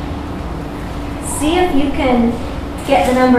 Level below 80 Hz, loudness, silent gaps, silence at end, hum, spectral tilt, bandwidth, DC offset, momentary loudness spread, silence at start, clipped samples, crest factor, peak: -28 dBFS; -17 LUFS; none; 0 s; none; -5.5 dB/octave; 15.5 kHz; under 0.1%; 11 LU; 0 s; under 0.1%; 14 dB; -2 dBFS